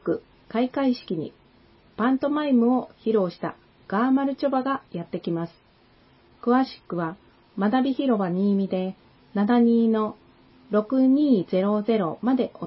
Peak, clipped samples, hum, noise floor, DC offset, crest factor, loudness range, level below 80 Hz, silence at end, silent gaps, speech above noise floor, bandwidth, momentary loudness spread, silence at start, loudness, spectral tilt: -8 dBFS; under 0.1%; none; -57 dBFS; under 0.1%; 16 dB; 5 LU; -64 dBFS; 0 s; none; 35 dB; 5.8 kHz; 12 LU; 0.05 s; -24 LUFS; -11.5 dB/octave